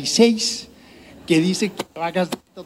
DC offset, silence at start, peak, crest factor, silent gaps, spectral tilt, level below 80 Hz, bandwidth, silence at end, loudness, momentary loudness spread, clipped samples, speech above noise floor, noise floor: under 0.1%; 0 s; -2 dBFS; 20 dB; none; -4 dB/octave; -58 dBFS; 16 kHz; 0 s; -20 LUFS; 12 LU; under 0.1%; 26 dB; -45 dBFS